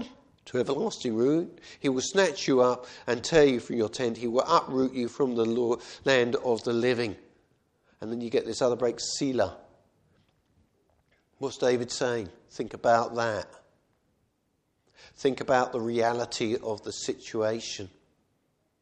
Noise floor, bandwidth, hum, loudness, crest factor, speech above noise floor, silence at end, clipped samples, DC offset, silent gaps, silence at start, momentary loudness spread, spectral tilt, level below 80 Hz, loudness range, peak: -74 dBFS; 10 kHz; none; -28 LUFS; 22 dB; 47 dB; 0.95 s; under 0.1%; under 0.1%; none; 0 s; 12 LU; -4.5 dB/octave; -62 dBFS; 6 LU; -6 dBFS